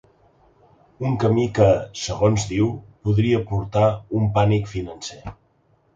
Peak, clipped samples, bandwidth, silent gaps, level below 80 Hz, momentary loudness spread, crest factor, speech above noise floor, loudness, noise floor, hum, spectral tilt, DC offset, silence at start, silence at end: -4 dBFS; under 0.1%; 7.8 kHz; none; -42 dBFS; 14 LU; 18 dB; 41 dB; -21 LUFS; -61 dBFS; none; -6.5 dB/octave; under 0.1%; 1 s; 0.65 s